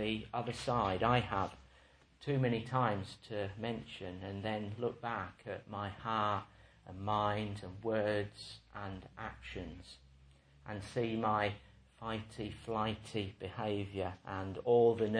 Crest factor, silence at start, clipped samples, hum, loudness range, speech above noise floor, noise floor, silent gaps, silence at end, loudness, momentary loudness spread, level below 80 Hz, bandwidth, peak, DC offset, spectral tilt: 22 dB; 0 s; under 0.1%; none; 5 LU; 28 dB; -65 dBFS; none; 0 s; -38 LUFS; 14 LU; -60 dBFS; 10.5 kHz; -16 dBFS; under 0.1%; -6.5 dB/octave